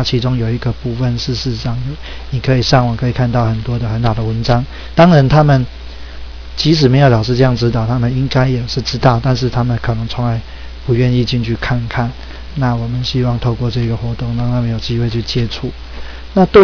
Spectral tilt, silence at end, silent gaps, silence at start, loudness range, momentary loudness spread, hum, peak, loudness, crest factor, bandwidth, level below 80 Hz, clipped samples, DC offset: -7 dB/octave; 0 s; none; 0 s; 5 LU; 14 LU; none; 0 dBFS; -15 LUFS; 14 dB; 5.4 kHz; -28 dBFS; 0.3%; 1%